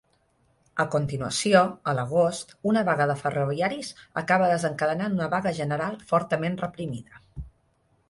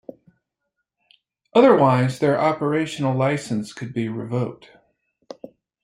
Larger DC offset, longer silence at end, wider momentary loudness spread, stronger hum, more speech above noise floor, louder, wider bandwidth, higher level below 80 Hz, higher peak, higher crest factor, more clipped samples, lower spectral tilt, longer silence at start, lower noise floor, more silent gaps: neither; second, 0.6 s vs 1.3 s; about the same, 14 LU vs 15 LU; neither; second, 42 dB vs 59 dB; second, -25 LUFS vs -20 LUFS; about the same, 11.5 kHz vs 11.5 kHz; first, -54 dBFS vs -64 dBFS; about the same, -4 dBFS vs -2 dBFS; about the same, 22 dB vs 20 dB; neither; second, -5.5 dB/octave vs -7 dB/octave; second, 0.75 s vs 1.55 s; second, -67 dBFS vs -79 dBFS; neither